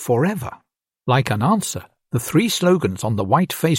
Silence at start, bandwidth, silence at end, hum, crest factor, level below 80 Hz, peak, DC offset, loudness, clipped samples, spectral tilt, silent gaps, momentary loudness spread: 0 s; 16.5 kHz; 0 s; none; 18 dB; -54 dBFS; -2 dBFS; under 0.1%; -19 LUFS; under 0.1%; -5.5 dB/octave; none; 12 LU